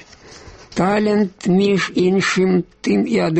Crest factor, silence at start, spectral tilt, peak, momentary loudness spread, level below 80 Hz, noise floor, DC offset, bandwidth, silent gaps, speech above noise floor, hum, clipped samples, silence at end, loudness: 14 dB; 0.3 s; -6 dB/octave; -4 dBFS; 4 LU; -50 dBFS; -41 dBFS; under 0.1%; 8.6 kHz; none; 25 dB; none; under 0.1%; 0 s; -17 LUFS